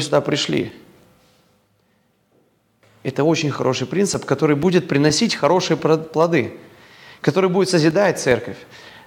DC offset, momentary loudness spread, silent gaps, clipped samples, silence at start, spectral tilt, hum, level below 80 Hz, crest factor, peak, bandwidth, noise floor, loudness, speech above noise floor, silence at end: under 0.1%; 8 LU; none; under 0.1%; 0 s; -5 dB/octave; none; -58 dBFS; 18 dB; -2 dBFS; 17 kHz; -62 dBFS; -18 LUFS; 44 dB; 0.1 s